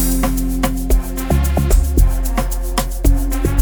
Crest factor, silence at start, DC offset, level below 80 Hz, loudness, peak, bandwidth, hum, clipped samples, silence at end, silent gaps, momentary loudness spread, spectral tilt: 14 dB; 0 s; under 0.1%; -16 dBFS; -18 LUFS; -2 dBFS; over 20 kHz; none; under 0.1%; 0 s; none; 5 LU; -5.5 dB/octave